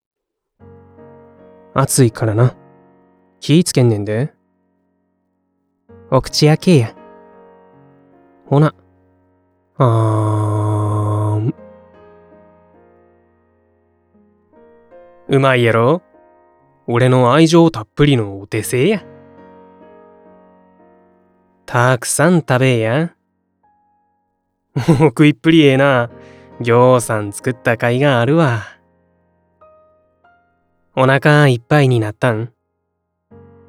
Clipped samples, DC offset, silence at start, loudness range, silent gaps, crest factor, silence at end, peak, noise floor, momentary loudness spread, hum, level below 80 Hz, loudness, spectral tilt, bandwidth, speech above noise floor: under 0.1%; under 0.1%; 1.75 s; 7 LU; none; 16 dB; 1.2 s; 0 dBFS; -71 dBFS; 12 LU; none; -48 dBFS; -14 LUFS; -6 dB/octave; 15 kHz; 59 dB